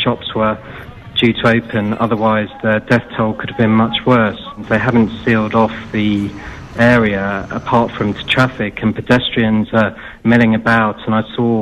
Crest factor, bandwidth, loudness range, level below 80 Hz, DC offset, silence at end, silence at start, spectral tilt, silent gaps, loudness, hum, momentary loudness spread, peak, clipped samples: 12 dB; 9 kHz; 1 LU; -40 dBFS; under 0.1%; 0 s; 0 s; -7 dB/octave; none; -15 LUFS; none; 8 LU; -2 dBFS; under 0.1%